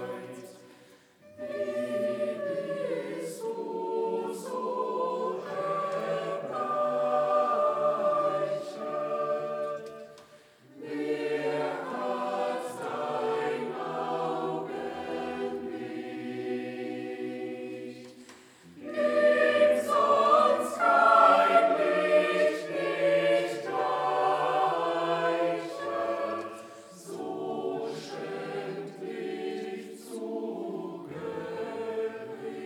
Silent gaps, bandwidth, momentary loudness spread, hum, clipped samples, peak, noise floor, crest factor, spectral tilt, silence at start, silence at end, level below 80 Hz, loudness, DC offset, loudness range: none; 15 kHz; 16 LU; none; under 0.1%; -8 dBFS; -57 dBFS; 22 dB; -5 dB/octave; 0 s; 0 s; -80 dBFS; -29 LUFS; under 0.1%; 13 LU